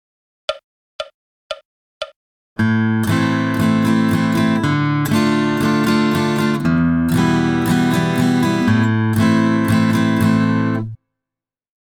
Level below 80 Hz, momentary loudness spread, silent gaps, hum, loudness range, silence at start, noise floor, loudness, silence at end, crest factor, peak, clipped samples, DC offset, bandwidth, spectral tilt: -46 dBFS; 16 LU; 0.64-0.99 s, 1.14-1.50 s, 1.65-2.01 s, 2.16-2.56 s; none; 4 LU; 0.5 s; -87 dBFS; -16 LUFS; 1.05 s; 14 dB; -2 dBFS; under 0.1%; under 0.1%; 18.5 kHz; -6.5 dB/octave